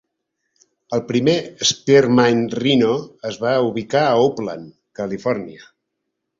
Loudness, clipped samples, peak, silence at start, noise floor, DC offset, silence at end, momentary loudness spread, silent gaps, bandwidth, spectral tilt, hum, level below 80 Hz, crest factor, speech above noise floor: -18 LUFS; under 0.1%; -2 dBFS; 0.9 s; -77 dBFS; under 0.1%; 0.85 s; 15 LU; none; 7.6 kHz; -4.5 dB/octave; none; -58 dBFS; 18 dB; 59 dB